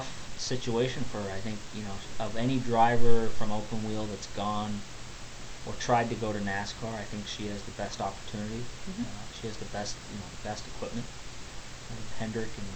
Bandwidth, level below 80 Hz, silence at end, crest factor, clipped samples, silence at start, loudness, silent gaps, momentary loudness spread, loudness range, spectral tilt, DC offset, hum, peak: 9 kHz; -44 dBFS; 0 s; 20 dB; under 0.1%; 0 s; -34 LUFS; none; 14 LU; 8 LU; -5 dB/octave; under 0.1%; none; -6 dBFS